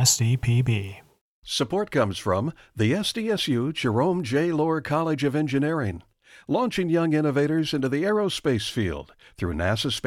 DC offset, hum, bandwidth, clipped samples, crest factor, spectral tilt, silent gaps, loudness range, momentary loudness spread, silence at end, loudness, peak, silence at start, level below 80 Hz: under 0.1%; none; 16 kHz; under 0.1%; 18 dB; -5 dB/octave; 1.21-1.42 s; 1 LU; 6 LU; 0 s; -24 LUFS; -6 dBFS; 0 s; -50 dBFS